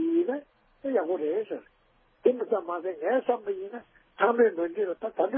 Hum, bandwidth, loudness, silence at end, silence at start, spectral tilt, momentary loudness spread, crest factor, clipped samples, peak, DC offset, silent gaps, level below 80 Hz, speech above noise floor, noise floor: none; 3.6 kHz; -28 LUFS; 0 s; 0 s; -9 dB/octave; 13 LU; 20 dB; under 0.1%; -10 dBFS; under 0.1%; none; -74 dBFS; 38 dB; -65 dBFS